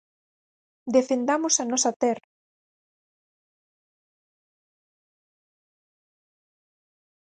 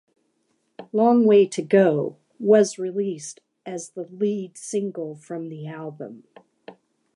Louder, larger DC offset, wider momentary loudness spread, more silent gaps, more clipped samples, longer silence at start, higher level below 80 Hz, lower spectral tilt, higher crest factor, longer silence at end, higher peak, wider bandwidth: about the same, -23 LUFS vs -21 LUFS; neither; second, 8 LU vs 18 LU; first, 1.96-2.00 s vs none; neither; about the same, 0.85 s vs 0.8 s; about the same, -80 dBFS vs -78 dBFS; second, -2 dB/octave vs -6 dB/octave; about the same, 22 dB vs 18 dB; first, 5.2 s vs 0.45 s; second, -8 dBFS vs -4 dBFS; second, 10 kHz vs 11.5 kHz